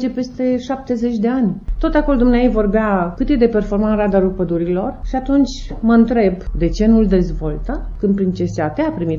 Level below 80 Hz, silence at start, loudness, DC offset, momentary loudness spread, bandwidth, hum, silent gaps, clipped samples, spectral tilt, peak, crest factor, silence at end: -26 dBFS; 0 s; -17 LUFS; under 0.1%; 8 LU; 7.2 kHz; none; none; under 0.1%; -8 dB/octave; -2 dBFS; 14 dB; 0 s